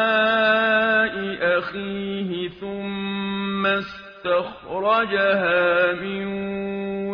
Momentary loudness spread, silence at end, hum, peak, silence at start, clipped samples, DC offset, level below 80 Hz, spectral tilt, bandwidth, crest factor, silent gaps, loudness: 11 LU; 0 s; none; -6 dBFS; 0 s; under 0.1%; under 0.1%; -56 dBFS; -2.5 dB/octave; 6.4 kHz; 16 dB; none; -22 LUFS